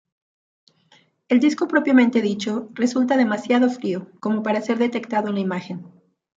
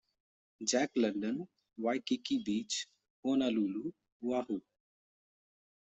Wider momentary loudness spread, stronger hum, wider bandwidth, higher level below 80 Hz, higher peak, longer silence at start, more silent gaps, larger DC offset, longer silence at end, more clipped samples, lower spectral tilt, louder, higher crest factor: about the same, 11 LU vs 10 LU; neither; about the same, 7.8 kHz vs 8.2 kHz; first, -72 dBFS vs -78 dBFS; first, -4 dBFS vs -18 dBFS; first, 1.3 s vs 0.6 s; second, none vs 3.10-3.23 s, 4.12-4.20 s; neither; second, 0.5 s vs 1.35 s; neither; first, -6 dB/octave vs -3.5 dB/octave; first, -21 LUFS vs -35 LUFS; about the same, 16 dB vs 20 dB